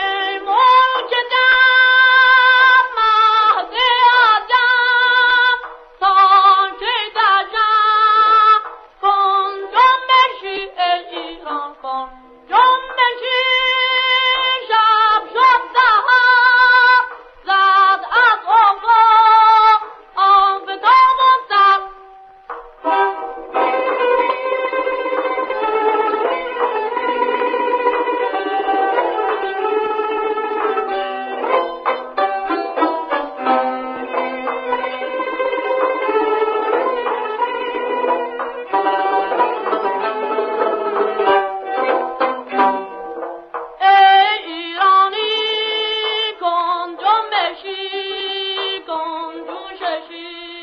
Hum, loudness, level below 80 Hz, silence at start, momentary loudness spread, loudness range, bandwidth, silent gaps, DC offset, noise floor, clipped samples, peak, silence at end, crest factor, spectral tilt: none; -14 LUFS; -56 dBFS; 0 s; 14 LU; 8 LU; 6.4 kHz; none; under 0.1%; -41 dBFS; under 0.1%; -2 dBFS; 0 s; 14 dB; -2.5 dB/octave